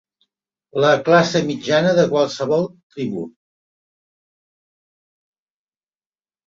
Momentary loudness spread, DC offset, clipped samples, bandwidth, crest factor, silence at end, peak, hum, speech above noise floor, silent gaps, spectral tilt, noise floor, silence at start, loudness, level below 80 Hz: 14 LU; under 0.1%; under 0.1%; 7.8 kHz; 20 dB; 3.2 s; -2 dBFS; none; over 73 dB; 2.83-2.90 s; -5.5 dB/octave; under -90 dBFS; 0.75 s; -18 LUFS; -62 dBFS